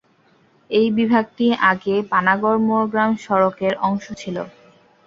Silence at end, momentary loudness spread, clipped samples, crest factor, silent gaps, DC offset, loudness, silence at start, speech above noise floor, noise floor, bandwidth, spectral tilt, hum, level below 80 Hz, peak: 0.55 s; 11 LU; under 0.1%; 18 dB; none; under 0.1%; -19 LUFS; 0.7 s; 39 dB; -57 dBFS; 7.6 kHz; -6.5 dB/octave; none; -60 dBFS; -2 dBFS